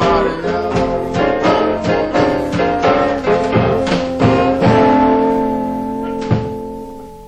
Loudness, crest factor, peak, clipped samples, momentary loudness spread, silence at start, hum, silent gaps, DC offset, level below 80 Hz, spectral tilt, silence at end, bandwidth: -15 LUFS; 14 dB; -2 dBFS; under 0.1%; 9 LU; 0 s; none; none; under 0.1%; -36 dBFS; -7 dB/octave; 0 s; 10 kHz